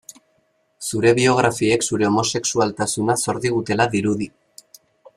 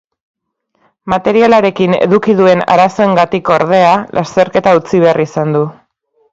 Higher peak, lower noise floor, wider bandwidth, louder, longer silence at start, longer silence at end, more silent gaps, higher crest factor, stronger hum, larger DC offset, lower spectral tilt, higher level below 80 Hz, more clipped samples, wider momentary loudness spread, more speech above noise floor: about the same, -2 dBFS vs 0 dBFS; first, -65 dBFS vs -61 dBFS; first, 15 kHz vs 7.8 kHz; second, -19 LUFS vs -10 LUFS; second, 0.8 s vs 1.05 s; first, 0.9 s vs 0.6 s; neither; first, 18 dB vs 12 dB; neither; neither; second, -4 dB/octave vs -6.5 dB/octave; second, -56 dBFS vs -48 dBFS; second, under 0.1% vs 0.1%; about the same, 8 LU vs 6 LU; second, 46 dB vs 51 dB